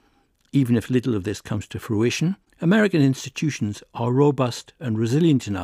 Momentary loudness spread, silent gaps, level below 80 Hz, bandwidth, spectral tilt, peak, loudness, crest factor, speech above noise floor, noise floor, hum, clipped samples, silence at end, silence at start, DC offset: 10 LU; none; -60 dBFS; 15.5 kHz; -6.5 dB/octave; -6 dBFS; -22 LUFS; 16 dB; 42 dB; -63 dBFS; none; under 0.1%; 0 s; 0.55 s; under 0.1%